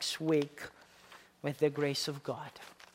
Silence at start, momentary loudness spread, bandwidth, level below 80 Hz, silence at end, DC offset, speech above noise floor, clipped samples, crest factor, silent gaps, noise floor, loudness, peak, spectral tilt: 0 s; 23 LU; 16 kHz; -76 dBFS; 0.2 s; under 0.1%; 24 dB; under 0.1%; 20 dB; none; -58 dBFS; -34 LUFS; -16 dBFS; -4.5 dB/octave